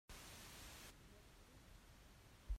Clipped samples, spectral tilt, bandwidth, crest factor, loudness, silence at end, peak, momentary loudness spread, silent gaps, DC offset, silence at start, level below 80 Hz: under 0.1%; -3 dB/octave; 16 kHz; 22 dB; -60 LUFS; 0 s; -36 dBFS; 9 LU; none; under 0.1%; 0.1 s; -58 dBFS